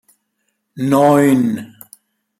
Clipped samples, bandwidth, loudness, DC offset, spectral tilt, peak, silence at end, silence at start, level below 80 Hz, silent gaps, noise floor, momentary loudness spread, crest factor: under 0.1%; 15.5 kHz; -14 LUFS; under 0.1%; -7 dB/octave; -2 dBFS; 0.75 s; 0.75 s; -58 dBFS; none; -70 dBFS; 15 LU; 16 dB